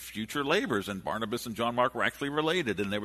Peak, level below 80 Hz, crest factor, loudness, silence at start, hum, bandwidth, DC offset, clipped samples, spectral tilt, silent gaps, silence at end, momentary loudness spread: -12 dBFS; -60 dBFS; 20 dB; -30 LUFS; 0 s; none; 13.5 kHz; under 0.1%; under 0.1%; -4.5 dB/octave; none; 0 s; 6 LU